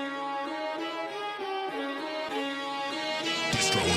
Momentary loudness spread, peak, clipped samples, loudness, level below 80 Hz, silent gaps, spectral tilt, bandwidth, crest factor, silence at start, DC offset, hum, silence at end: 8 LU; -14 dBFS; under 0.1%; -31 LUFS; -58 dBFS; none; -3 dB/octave; 16 kHz; 18 dB; 0 s; under 0.1%; none; 0 s